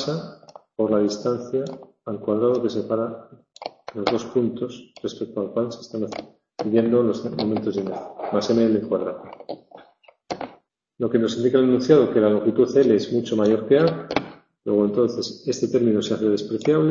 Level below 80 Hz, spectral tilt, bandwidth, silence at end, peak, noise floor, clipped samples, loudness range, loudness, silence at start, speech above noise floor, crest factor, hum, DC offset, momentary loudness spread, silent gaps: -62 dBFS; -6.5 dB/octave; 7.6 kHz; 0 s; -2 dBFS; -55 dBFS; under 0.1%; 7 LU; -22 LUFS; 0 s; 33 dB; 20 dB; none; under 0.1%; 17 LU; none